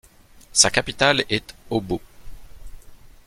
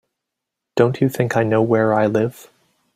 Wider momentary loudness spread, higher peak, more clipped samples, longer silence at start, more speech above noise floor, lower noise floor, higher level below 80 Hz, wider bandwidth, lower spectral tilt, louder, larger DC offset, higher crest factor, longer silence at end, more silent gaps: first, 12 LU vs 6 LU; about the same, 0 dBFS vs -2 dBFS; neither; second, 0.35 s vs 0.75 s; second, 27 dB vs 65 dB; second, -48 dBFS vs -82 dBFS; first, -44 dBFS vs -60 dBFS; about the same, 16.5 kHz vs 16 kHz; second, -2 dB/octave vs -7.5 dB/octave; about the same, -20 LUFS vs -18 LUFS; neither; first, 24 dB vs 18 dB; second, 0.2 s vs 0.55 s; neither